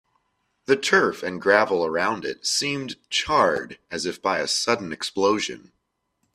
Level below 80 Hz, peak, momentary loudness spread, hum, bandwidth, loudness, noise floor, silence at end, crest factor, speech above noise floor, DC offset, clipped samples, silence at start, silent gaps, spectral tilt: -60 dBFS; 0 dBFS; 11 LU; none; 14.5 kHz; -23 LUFS; -74 dBFS; 0.75 s; 24 dB; 50 dB; under 0.1%; under 0.1%; 0.7 s; none; -2.5 dB/octave